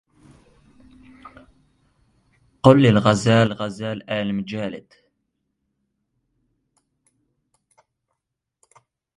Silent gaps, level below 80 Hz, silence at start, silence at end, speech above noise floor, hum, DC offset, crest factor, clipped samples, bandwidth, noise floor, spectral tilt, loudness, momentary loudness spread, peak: none; -54 dBFS; 1.25 s; 4.4 s; 63 dB; none; under 0.1%; 24 dB; under 0.1%; 11.5 kHz; -81 dBFS; -6.5 dB/octave; -19 LUFS; 16 LU; 0 dBFS